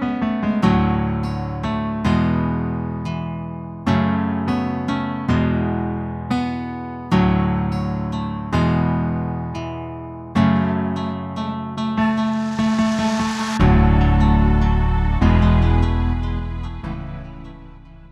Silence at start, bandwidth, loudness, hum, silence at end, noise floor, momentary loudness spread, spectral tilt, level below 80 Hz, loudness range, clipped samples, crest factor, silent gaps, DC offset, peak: 0 s; 10 kHz; -20 LUFS; none; 0.05 s; -40 dBFS; 13 LU; -7.5 dB/octave; -26 dBFS; 5 LU; under 0.1%; 16 dB; none; under 0.1%; -2 dBFS